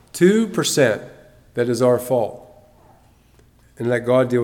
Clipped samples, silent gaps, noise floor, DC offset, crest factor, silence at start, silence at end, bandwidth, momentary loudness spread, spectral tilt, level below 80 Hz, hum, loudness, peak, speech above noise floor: under 0.1%; none; -53 dBFS; under 0.1%; 18 dB; 0.15 s; 0 s; 17.5 kHz; 12 LU; -5 dB/octave; -58 dBFS; none; -19 LUFS; -2 dBFS; 35 dB